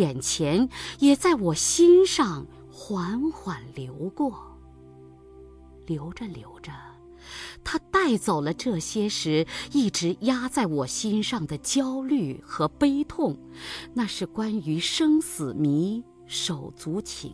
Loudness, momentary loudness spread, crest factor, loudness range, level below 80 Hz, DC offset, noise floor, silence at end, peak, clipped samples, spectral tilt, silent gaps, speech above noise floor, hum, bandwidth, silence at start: -25 LUFS; 16 LU; 18 dB; 13 LU; -52 dBFS; under 0.1%; -48 dBFS; 0 s; -8 dBFS; under 0.1%; -4.5 dB/octave; none; 23 dB; none; 11 kHz; 0 s